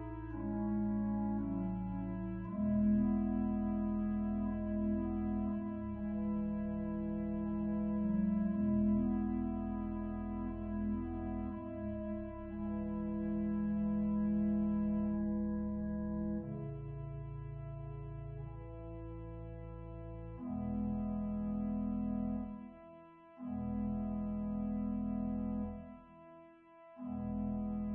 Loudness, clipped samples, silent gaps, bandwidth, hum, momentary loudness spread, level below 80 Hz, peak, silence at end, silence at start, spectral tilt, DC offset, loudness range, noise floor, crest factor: -38 LUFS; under 0.1%; none; 3.2 kHz; none; 14 LU; -50 dBFS; -22 dBFS; 0 s; 0 s; -11 dB/octave; under 0.1%; 7 LU; -59 dBFS; 14 dB